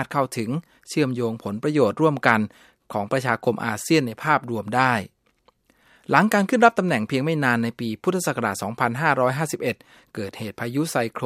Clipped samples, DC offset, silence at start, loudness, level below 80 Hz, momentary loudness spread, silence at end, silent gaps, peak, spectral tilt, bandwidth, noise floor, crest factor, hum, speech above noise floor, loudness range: under 0.1%; under 0.1%; 0 s; -22 LUFS; -66 dBFS; 13 LU; 0 s; none; 0 dBFS; -5.5 dB/octave; 16 kHz; -63 dBFS; 22 dB; none; 40 dB; 3 LU